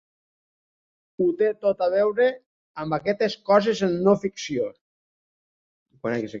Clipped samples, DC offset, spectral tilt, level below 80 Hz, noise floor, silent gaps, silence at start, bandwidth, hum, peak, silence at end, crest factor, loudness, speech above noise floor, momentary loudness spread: under 0.1%; under 0.1%; -6 dB/octave; -64 dBFS; under -90 dBFS; 2.46-2.74 s, 4.81-5.86 s; 1.2 s; 7.6 kHz; none; -4 dBFS; 0 s; 20 dB; -23 LUFS; over 68 dB; 11 LU